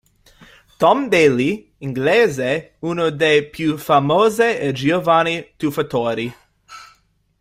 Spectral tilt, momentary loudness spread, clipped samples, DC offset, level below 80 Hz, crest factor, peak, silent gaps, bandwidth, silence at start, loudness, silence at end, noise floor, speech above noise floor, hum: -5.5 dB/octave; 9 LU; under 0.1%; under 0.1%; -54 dBFS; 16 dB; -2 dBFS; none; 16 kHz; 0.8 s; -17 LUFS; 0.55 s; -58 dBFS; 41 dB; none